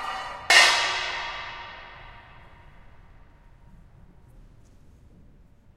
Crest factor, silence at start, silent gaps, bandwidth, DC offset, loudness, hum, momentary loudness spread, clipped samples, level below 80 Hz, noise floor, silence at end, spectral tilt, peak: 28 dB; 0 s; none; 16 kHz; under 0.1%; -20 LUFS; none; 28 LU; under 0.1%; -52 dBFS; -53 dBFS; 1.35 s; 0.5 dB/octave; 0 dBFS